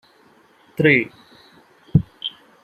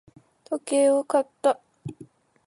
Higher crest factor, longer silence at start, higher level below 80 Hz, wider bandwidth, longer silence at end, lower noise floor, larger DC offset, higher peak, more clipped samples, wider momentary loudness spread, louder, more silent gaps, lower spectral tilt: about the same, 22 dB vs 18 dB; first, 0.8 s vs 0.5 s; first, -48 dBFS vs -70 dBFS; first, 13 kHz vs 11.5 kHz; about the same, 0.35 s vs 0.45 s; about the same, -54 dBFS vs -51 dBFS; neither; first, -2 dBFS vs -8 dBFS; neither; second, 16 LU vs 20 LU; first, -19 LUFS vs -24 LUFS; neither; first, -8 dB/octave vs -4.5 dB/octave